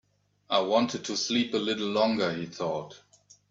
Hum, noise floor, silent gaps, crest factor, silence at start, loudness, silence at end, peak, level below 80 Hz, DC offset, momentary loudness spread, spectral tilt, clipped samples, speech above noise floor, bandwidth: 50 Hz at -55 dBFS; -52 dBFS; none; 20 dB; 0.5 s; -28 LUFS; 0.55 s; -10 dBFS; -70 dBFS; under 0.1%; 8 LU; -4 dB/octave; under 0.1%; 24 dB; 7.8 kHz